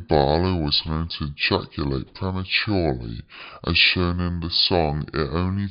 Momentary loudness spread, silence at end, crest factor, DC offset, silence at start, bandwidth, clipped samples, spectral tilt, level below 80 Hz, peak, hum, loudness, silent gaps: 12 LU; 0 s; 20 dB; under 0.1%; 0 s; 5.6 kHz; under 0.1%; -9.5 dB/octave; -38 dBFS; -4 dBFS; none; -22 LUFS; none